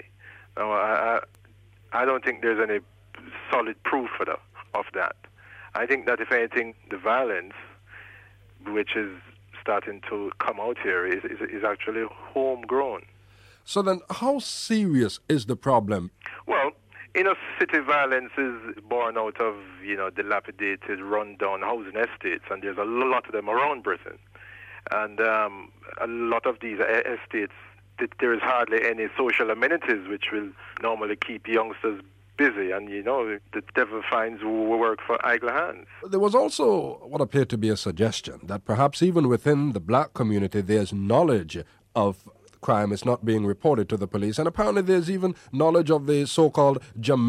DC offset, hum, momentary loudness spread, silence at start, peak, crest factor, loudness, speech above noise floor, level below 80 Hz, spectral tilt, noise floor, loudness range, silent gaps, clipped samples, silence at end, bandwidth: under 0.1%; none; 11 LU; 0.25 s; -8 dBFS; 18 dB; -25 LUFS; 29 dB; -60 dBFS; -6 dB/octave; -54 dBFS; 5 LU; none; under 0.1%; 0 s; 14 kHz